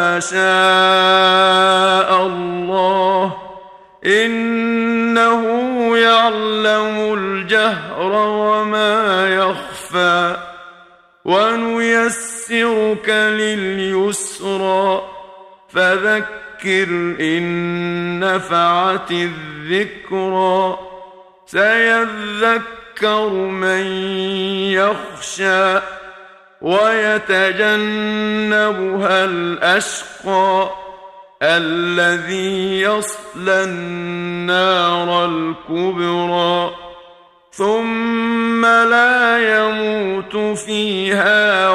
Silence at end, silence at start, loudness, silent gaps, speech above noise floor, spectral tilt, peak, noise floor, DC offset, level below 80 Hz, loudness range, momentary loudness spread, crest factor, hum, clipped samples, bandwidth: 0 s; 0 s; -15 LUFS; none; 31 dB; -3.5 dB/octave; 0 dBFS; -46 dBFS; under 0.1%; -58 dBFS; 4 LU; 10 LU; 16 dB; none; under 0.1%; 14.5 kHz